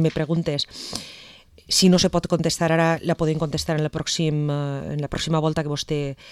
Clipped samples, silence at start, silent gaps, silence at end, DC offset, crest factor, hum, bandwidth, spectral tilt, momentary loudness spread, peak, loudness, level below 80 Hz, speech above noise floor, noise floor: under 0.1%; 0 s; none; 0 s; under 0.1%; 16 dB; none; 14.5 kHz; -5 dB/octave; 10 LU; -6 dBFS; -22 LUFS; -46 dBFS; 25 dB; -48 dBFS